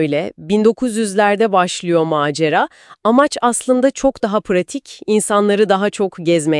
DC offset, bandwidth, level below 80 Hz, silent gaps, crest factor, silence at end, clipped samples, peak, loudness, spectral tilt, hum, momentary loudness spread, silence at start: under 0.1%; 12 kHz; -52 dBFS; none; 16 dB; 0 s; under 0.1%; 0 dBFS; -16 LUFS; -4.5 dB/octave; none; 6 LU; 0 s